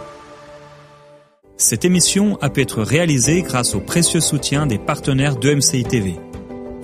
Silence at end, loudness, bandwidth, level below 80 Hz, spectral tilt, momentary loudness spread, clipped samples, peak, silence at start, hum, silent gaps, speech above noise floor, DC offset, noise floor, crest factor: 0 s; -16 LUFS; 15.5 kHz; -42 dBFS; -4 dB/octave; 11 LU; under 0.1%; 0 dBFS; 0 s; none; none; 31 dB; under 0.1%; -48 dBFS; 18 dB